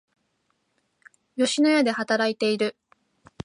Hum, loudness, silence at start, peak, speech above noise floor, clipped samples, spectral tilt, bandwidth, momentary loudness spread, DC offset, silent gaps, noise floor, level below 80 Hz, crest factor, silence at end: none; -23 LUFS; 1.35 s; -8 dBFS; 50 dB; under 0.1%; -3.5 dB/octave; 11.5 kHz; 8 LU; under 0.1%; none; -72 dBFS; -68 dBFS; 18 dB; 0.75 s